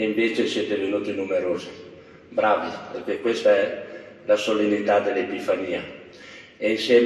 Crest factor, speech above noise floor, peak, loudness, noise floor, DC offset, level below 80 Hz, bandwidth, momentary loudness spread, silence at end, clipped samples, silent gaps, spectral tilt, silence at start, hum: 18 dB; 22 dB; -6 dBFS; -23 LUFS; -44 dBFS; under 0.1%; -68 dBFS; 12 kHz; 19 LU; 0 s; under 0.1%; none; -4.5 dB/octave; 0 s; none